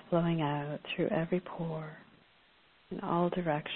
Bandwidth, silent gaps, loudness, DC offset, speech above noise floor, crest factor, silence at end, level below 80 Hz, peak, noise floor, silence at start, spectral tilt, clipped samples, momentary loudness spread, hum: 4.2 kHz; none; -34 LUFS; under 0.1%; 32 dB; 16 dB; 0 s; -62 dBFS; -18 dBFS; -65 dBFS; 0.05 s; -10.5 dB/octave; under 0.1%; 12 LU; none